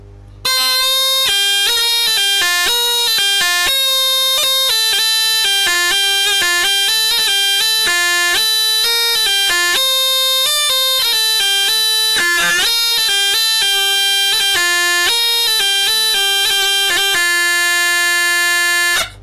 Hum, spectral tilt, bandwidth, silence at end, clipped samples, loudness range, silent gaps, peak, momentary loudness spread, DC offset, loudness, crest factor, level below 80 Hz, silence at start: none; 2 dB/octave; 16 kHz; 0 s; under 0.1%; 0 LU; none; -6 dBFS; 1 LU; under 0.1%; -11 LUFS; 8 dB; -50 dBFS; 0 s